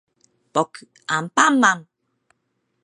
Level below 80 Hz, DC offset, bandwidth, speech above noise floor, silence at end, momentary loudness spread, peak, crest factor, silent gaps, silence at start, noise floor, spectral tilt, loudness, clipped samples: -74 dBFS; under 0.1%; 11.5 kHz; 53 dB; 1.05 s; 14 LU; -2 dBFS; 22 dB; none; 0.55 s; -73 dBFS; -3 dB/octave; -19 LUFS; under 0.1%